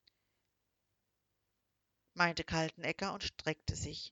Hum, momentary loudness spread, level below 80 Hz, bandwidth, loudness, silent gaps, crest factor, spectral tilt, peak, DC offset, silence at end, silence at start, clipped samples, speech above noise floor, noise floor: 50 Hz at -70 dBFS; 7 LU; -58 dBFS; 9.4 kHz; -37 LUFS; none; 24 dB; -4 dB/octave; -16 dBFS; under 0.1%; 0 s; 2.15 s; under 0.1%; 47 dB; -84 dBFS